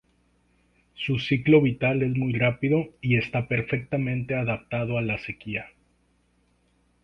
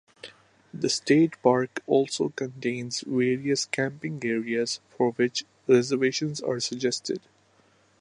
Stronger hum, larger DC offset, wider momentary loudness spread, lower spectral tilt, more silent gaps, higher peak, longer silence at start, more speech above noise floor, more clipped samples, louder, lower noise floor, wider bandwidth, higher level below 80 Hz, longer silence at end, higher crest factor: first, 60 Hz at -45 dBFS vs none; neither; about the same, 12 LU vs 10 LU; first, -8.5 dB/octave vs -4.5 dB/octave; neither; about the same, -6 dBFS vs -6 dBFS; first, 1 s vs 0.25 s; first, 42 dB vs 37 dB; neither; about the same, -25 LUFS vs -26 LUFS; first, -66 dBFS vs -62 dBFS; second, 6.2 kHz vs 11 kHz; first, -54 dBFS vs -74 dBFS; first, 1.35 s vs 0.8 s; about the same, 20 dB vs 20 dB